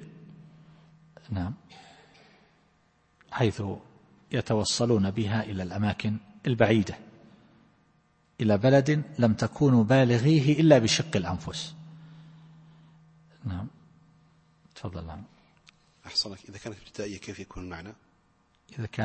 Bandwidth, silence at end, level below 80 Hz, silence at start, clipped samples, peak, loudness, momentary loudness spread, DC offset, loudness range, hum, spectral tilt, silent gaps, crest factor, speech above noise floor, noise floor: 8.8 kHz; 0 s; -56 dBFS; 0 s; under 0.1%; -4 dBFS; -26 LUFS; 21 LU; under 0.1%; 20 LU; none; -6 dB/octave; none; 24 dB; 41 dB; -66 dBFS